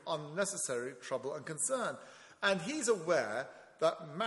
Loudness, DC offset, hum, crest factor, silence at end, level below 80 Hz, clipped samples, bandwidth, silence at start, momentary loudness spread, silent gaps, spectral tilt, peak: -35 LUFS; under 0.1%; none; 22 dB; 0 s; -82 dBFS; under 0.1%; 11.5 kHz; 0 s; 9 LU; none; -3 dB/octave; -14 dBFS